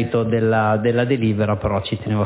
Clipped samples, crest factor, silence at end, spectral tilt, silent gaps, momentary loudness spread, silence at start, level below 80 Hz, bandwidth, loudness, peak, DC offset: under 0.1%; 12 dB; 0 s; -11.5 dB/octave; none; 5 LU; 0 s; -42 dBFS; 4 kHz; -19 LUFS; -6 dBFS; under 0.1%